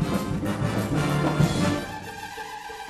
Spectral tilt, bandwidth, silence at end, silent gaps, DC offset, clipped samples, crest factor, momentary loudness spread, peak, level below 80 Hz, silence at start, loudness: -6 dB/octave; 14 kHz; 0 s; none; under 0.1%; under 0.1%; 18 dB; 13 LU; -8 dBFS; -44 dBFS; 0 s; -26 LUFS